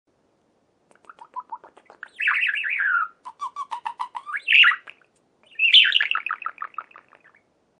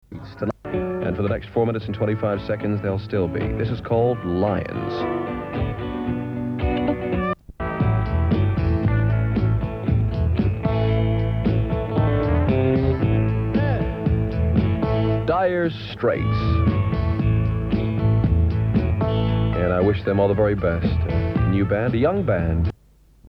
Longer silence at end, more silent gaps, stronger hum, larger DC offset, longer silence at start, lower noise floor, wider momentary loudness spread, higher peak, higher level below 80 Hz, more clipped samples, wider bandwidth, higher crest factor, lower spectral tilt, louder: first, 1 s vs 0 s; neither; neither; neither; first, 1.35 s vs 0.1 s; first, -66 dBFS vs -53 dBFS; first, 25 LU vs 6 LU; about the same, -4 dBFS vs -6 dBFS; second, -86 dBFS vs -30 dBFS; neither; first, 10.5 kHz vs 5.6 kHz; first, 20 dB vs 14 dB; second, 2.5 dB/octave vs -10 dB/octave; first, -18 LUFS vs -22 LUFS